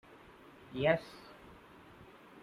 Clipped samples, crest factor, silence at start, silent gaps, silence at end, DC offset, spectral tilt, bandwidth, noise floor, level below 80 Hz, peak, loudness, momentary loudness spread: under 0.1%; 24 dB; 0.7 s; none; 0.05 s; under 0.1%; -7 dB/octave; 14 kHz; -57 dBFS; -66 dBFS; -16 dBFS; -34 LUFS; 25 LU